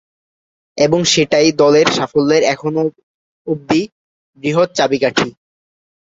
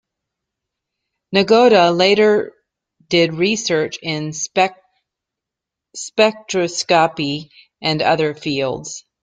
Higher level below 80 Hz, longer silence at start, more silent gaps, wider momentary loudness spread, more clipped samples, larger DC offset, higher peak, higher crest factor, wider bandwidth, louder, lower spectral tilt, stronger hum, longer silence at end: first, -54 dBFS vs -60 dBFS; second, 0.75 s vs 1.3 s; first, 3.03-3.45 s, 3.92-4.33 s vs none; about the same, 13 LU vs 12 LU; neither; neither; about the same, 0 dBFS vs -2 dBFS; about the same, 16 dB vs 18 dB; second, 7.8 kHz vs 9.4 kHz; about the same, -14 LUFS vs -16 LUFS; about the same, -4 dB/octave vs -4 dB/octave; neither; first, 0.8 s vs 0.25 s